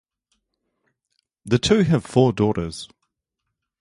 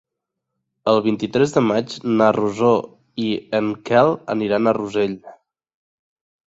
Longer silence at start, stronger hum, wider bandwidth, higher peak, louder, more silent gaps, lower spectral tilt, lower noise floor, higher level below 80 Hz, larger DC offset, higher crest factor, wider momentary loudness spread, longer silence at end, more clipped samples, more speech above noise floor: first, 1.45 s vs 0.85 s; neither; first, 11.5 kHz vs 8 kHz; about the same, -2 dBFS vs -2 dBFS; about the same, -20 LUFS vs -19 LUFS; neither; about the same, -6 dB/octave vs -6.5 dB/octave; about the same, -80 dBFS vs -81 dBFS; first, -48 dBFS vs -60 dBFS; neither; about the same, 22 dB vs 18 dB; first, 16 LU vs 8 LU; second, 0.95 s vs 1.15 s; neither; about the same, 61 dB vs 62 dB